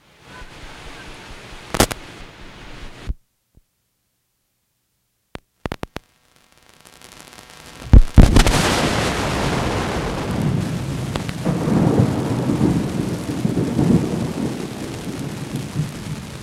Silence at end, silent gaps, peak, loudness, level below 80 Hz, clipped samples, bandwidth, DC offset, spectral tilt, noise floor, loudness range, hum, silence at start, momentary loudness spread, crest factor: 0 s; none; 0 dBFS; -20 LUFS; -24 dBFS; under 0.1%; 16.5 kHz; under 0.1%; -5.5 dB/octave; -70 dBFS; 21 LU; none; 0.3 s; 24 LU; 20 dB